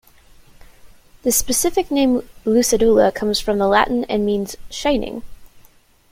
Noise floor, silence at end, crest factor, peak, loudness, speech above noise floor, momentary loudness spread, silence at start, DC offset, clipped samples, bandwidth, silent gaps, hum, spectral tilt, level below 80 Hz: -51 dBFS; 0.5 s; 18 dB; -2 dBFS; -18 LUFS; 34 dB; 9 LU; 0.85 s; under 0.1%; under 0.1%; 16.5 kHz; none; none; -3.5 dB/octave; -40 dBFS